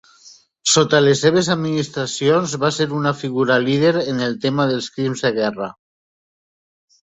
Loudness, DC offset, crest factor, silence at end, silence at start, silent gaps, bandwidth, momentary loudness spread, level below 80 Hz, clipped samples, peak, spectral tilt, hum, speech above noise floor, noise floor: -18 LUFS; under 0.1%; 18 dB; 1.4 s; 0.25 s; none; 8.4 kHz; 9 LU; -60 dBFS; under 0.1%; -2 dBFS; -4.5 dB/octave; none; 30 dB; -48 dBFS